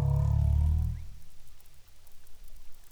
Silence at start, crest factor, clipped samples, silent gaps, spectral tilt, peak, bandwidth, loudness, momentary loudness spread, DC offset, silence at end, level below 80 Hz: 0 s; 12 dB; under 0.1%; none; -9 dB/octave; -18 dBFS; 7.4 kHz; -29 LUFS; 16 LU; under 0.1%; 0.05 s; -34 dBFS